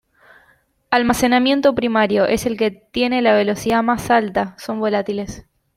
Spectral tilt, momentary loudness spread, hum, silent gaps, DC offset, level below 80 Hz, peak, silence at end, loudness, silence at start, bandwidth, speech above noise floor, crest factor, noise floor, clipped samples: -4.5 dB/octave; 8 LU; none; none; under 0.1%; -48 dBFS; -2 dBFS; 0.35 s; -18 LUFS; 0.9 s; 16 kHz; 40 dB; 16 dB; -58 dBFS; under 0.1%